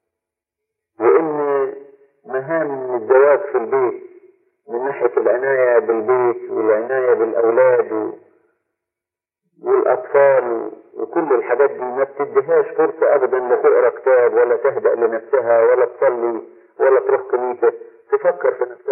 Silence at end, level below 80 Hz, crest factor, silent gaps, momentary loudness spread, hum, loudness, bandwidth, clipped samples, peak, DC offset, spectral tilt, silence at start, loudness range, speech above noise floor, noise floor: 0 s; under -90 dBFS; 16 dB; none; 10 LU; none; -17 LUFS; 3 kHz; under 0.1%; -2 dBFS; under 0.1%; -11.5 dB/octave; 1 s; 4 LU; 71 dB; -87 dBFS